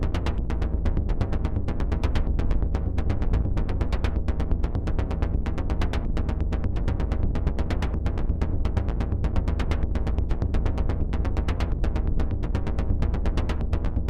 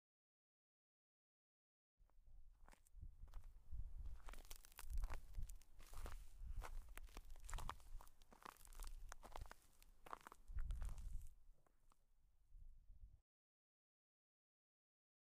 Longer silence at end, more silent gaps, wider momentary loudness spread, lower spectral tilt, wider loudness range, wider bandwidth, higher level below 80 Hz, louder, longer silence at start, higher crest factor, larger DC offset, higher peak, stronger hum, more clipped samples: second, 0 s vs 2.05 s; neither; second, 2 LU vs 11 LU; first, -8 dB/octave vs -4 dB/octave; second, 1 LU vs 6 LU; second, 7.8 kHz vs 15.5 kHz; first, -26 dBFS vs -56 dBFS; first, -28 LUFS vs -59 LUFS; second, 0 s vs 2 s; second, 14 dB vs 22 dB; neither; first, -10 dBFS vs -32 dBFS; neither; neither